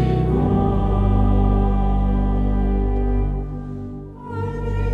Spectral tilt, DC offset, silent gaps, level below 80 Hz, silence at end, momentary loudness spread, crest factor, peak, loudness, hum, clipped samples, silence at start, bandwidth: -10.5 dB/octave; under 0.1%; none; -22 dBFS; 0 s; 13 LU; 14 dB; -6 dBFS; -21 LUFS; 50 Hz at -20 dBFS; under 0.1%; 0 s; 3.9 kHz